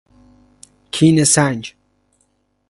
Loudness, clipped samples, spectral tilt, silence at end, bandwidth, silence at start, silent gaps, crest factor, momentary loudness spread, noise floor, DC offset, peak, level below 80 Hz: -15 LUFS; under 0.1%; -4 dB/octave; 1 s; 11.5 kHz; 0.95 s; none; 18 dB; 16 LU; -64 dBFS; under 0.1%; 0 dBFS; -54 dBFS